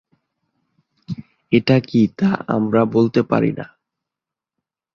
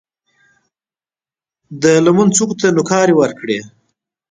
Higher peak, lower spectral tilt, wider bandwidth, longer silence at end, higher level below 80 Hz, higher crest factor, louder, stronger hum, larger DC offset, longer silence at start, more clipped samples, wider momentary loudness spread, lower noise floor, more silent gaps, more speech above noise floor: about the same, -2 dBFS vs 0 dBFS; first, -8.5 dB/octave vs -5 dB/octave; second, 6.8 kHz vs 9.6 kHz; first, 1.3 s vs 0.65 s; about the same, -56 dBFS vs -56 dBFS; about the same, 18 dB vs 16 dB; second, -18 LUFS vs -13 LUFS; neither; neither; second, 1.1 s vs 1.7 s; neither; first, 17 LU vs 11 LU; about the same, -87 dBFS vs under -90 dBFS; neither; second, 70 dB vs over 77 dB